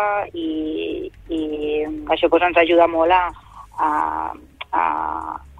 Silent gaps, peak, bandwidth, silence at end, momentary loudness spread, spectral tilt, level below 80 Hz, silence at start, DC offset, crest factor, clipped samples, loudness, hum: none; -2 dBFS; 9.6 kHz; 0 s; 13 LU; -6 dB/octave; -46 dBFS; 0 s; under 0.1%; 18 dB; under 0.1%; -20 LUFS; none